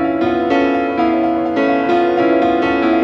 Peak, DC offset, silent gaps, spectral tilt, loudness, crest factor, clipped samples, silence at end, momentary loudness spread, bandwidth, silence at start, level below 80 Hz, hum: -2 dBFS; under 0.1%; none; -7 dB/octave; -15 LUFS; 12 dB; under 0.1%; 0 s; 2 LU; 6.4 kHz; 0 s; -48 dBFS; none